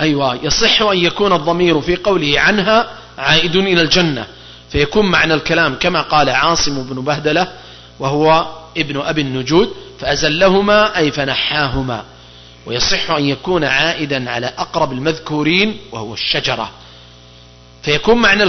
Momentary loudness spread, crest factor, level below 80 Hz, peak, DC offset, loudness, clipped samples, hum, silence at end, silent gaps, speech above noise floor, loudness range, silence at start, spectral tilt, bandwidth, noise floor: 10 LU; 14 dB; -36 dBFS; 0 dBFS; under 0.1%; -14 LUFS; under 0.1%; 60 Hz at -45 dBFS; 0 s; none; 27 dB; 4 LU; 0 s; -4 dB/octave; 6.4 kHz; -41 dBFS